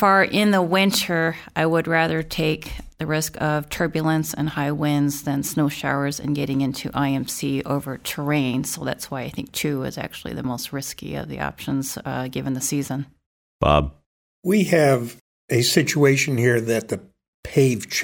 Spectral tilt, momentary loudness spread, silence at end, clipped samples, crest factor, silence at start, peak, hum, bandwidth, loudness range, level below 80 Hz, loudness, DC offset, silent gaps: -5 dB/octave; 12 LU; 0 s; under 0.1%; 20 dB; 0 s; -2 dBFS; none; 18 kHz; 7 LU; -44 dBFS; -22 LUFS; under 0.1%; 13.26-13.60 s, 14.06-14.42 s, 15.21-15.48 s, 17.28-17.43 s